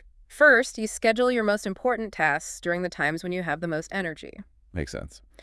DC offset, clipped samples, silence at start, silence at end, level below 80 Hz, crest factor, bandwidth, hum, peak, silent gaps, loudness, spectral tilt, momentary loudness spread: under 0.1%; under 0.1%; 0.3 s; 0.25 s; -52 dBFS; 20 dB; 12 kHz; none; -6 dBFS; none; -25 LUFS; -4.5 dB/octave; 17 LU